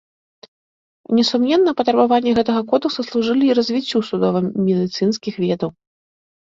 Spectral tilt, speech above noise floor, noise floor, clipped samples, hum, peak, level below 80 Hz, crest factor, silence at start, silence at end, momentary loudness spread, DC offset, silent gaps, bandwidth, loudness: -6 dB/octave; over 73 dB; under -90 dBFS; under 0.1%; none; -2 dBFS; -58 dBFS; 16 dB; 1.1 s; 0.8 s; 6 LU; under 0.1%; none; 7.6 kHz; -18 LUFS